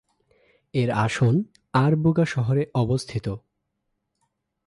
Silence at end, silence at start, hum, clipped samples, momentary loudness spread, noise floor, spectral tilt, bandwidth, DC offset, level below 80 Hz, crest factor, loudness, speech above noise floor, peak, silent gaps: 1.3 s; 0.75 s; none; under 0.1%; 10 LU; -77 dBFS; -7.5 dB/octave; 11.5 kHz; under 0.1%; -52 dBFS; 16 dB; -23 LUFS; 55 dB; -8 dBFS; none